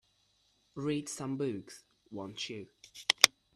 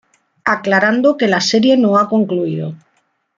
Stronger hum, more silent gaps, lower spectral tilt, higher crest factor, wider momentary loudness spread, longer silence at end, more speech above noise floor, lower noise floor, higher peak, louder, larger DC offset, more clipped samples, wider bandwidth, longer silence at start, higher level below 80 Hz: neither; neither; second, -2 dB/octave vs -5 dB/octave; first, 36 dB vs 14 dB; first, 25 LU vs 10 LU; second, 0.25 s vs 0.6 s; second, 39 dB vs 49 dB; first, -73 dBFS vs -63 dBFS; about the same, 0 dBFS vs 0 dBFS; second, -32 LUFS vs -14 LUFS; neither; neither; first, 14 kHz vs 7.6 kHz; first, 0.75 s vs 0.45 s; second, -72 dBFS vs -60 dBFS